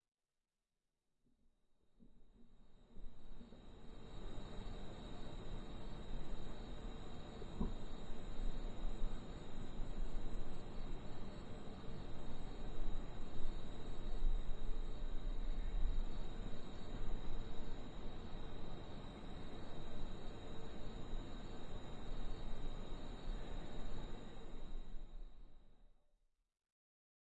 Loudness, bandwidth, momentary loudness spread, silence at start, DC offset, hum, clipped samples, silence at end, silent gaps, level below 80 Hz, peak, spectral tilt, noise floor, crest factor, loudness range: -52 LUFS; 7.6 kHz; 8 LU; 2 s; under 0.1%; none; under 0.1%; 1.45 s; none; -46 dBFS; -24 dBFS; -6.5 dB/octave; under -90 dBFS; 16 dB; 8 LU